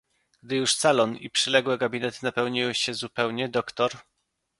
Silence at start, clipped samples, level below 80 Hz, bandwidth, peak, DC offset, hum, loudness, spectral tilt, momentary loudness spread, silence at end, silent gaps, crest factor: 0.45 s; under 0.1%; -68 dBFS; 11.5 kHz; -4 dBFS; under 0.1%; none; -25 LUFS; -3 dB/octave; 7 LU; 0.6 s; none; 22 dB